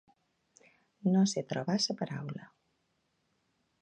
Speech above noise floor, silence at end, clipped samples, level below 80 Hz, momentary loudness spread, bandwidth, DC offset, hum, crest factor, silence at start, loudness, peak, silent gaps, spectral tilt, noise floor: 46 dB; 1.35 s; under 0.1%; -80 dBFS; 14 LU; 9.4 kHz; under 0.1%; none; 18 dB; 1.05 s; -32 LUFS; -18 dBFS; none; -5 dB/octave; -78 dBFS